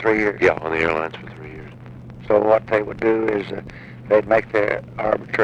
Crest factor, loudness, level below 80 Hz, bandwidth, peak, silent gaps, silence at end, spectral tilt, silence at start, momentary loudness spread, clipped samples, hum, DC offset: 18 dB; -20 LUFS; -48 dBFS; 8.4 kHz; -4 dBFS; none; 0 s; -7 dB/octave; 0 s; 21 LU; under 0.1%; none; under 0.1%